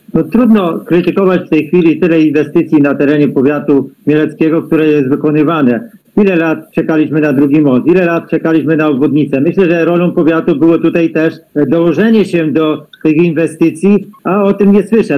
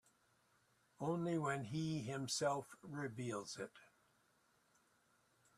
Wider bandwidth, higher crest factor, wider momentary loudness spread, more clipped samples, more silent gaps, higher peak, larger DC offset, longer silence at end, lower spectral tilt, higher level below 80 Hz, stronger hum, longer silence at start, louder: about the same, 14 kHz vs 14 kHz; second, 8 dB vs 20 dB; second, 4 LU vs 10 LU; neither; neither; first, 0 dBFS vs -26 dBFS; neither; second, 0 s vs 1.75 s; first, -8.5 dB/octave vs -5 dB/octave; first, -48 dBFS vs -82 dBFS; neither; second, 0.15 s vs 1 s; first, -10 LUFS vs -43 LUFS